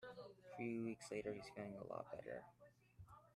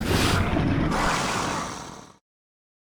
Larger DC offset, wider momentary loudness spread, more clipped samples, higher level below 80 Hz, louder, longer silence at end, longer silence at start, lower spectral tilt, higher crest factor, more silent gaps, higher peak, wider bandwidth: neither; about the same, 18 LU vs 16 LU; neither; second, -78 dBFS vs -36 dBFS; second, -51 LUFS vs -24 LUFS; second, 0 s vs 0.9 s; about the same, 0 s vs 0 s; first, -6 dB/octave vs -4.5 dB/octave; about the same, 18 dB vs 16 dB; neither; second, -34 dBFS vs -10 dBFS; second, 13 kHz vs over 20 kHz